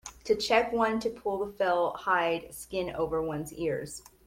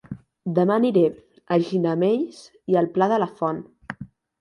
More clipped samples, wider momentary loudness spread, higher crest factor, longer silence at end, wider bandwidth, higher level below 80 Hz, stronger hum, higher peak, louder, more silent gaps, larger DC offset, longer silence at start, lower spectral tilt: neither; second, 10 LU vs 18 LU; about the same, 20 dB vs 16 dB; about the same, 0.25 s vs 0.35 s; first, 16.5 kHz vs 11 kHz; first, -56 dBFS vs -64 dBFS; neither; second, -10 dBFS vs -6 dBFS; second, -30 LUFS vs -22 LUFS; neither; neither; about the same, 0.05 s vs 0.1 s; second, -4 dB/octave vs -8 dB/octave